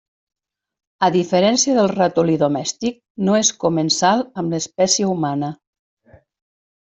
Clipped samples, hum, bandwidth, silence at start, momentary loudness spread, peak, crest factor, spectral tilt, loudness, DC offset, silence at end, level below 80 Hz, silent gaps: under 0.1%; none; 8.4 kHz; 1 s; 8 LU; -2 dBFS; 18 dB; -4 dB/octave; -18 LUFS; under 0.1%; 1.25 s; -60 dBFS; 3.10-3.15 s